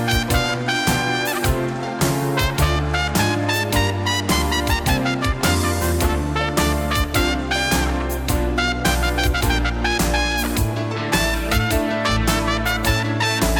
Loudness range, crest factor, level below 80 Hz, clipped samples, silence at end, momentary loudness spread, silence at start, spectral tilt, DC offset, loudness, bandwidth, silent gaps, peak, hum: 1 LU; 14 dB; -26 dBFS; under 0.1%; 0 s; 2 LU; 0 s; -4 dB/octave; under 0.1%; -20 LUFS; over 20 kHz; none; -4 dBFS; none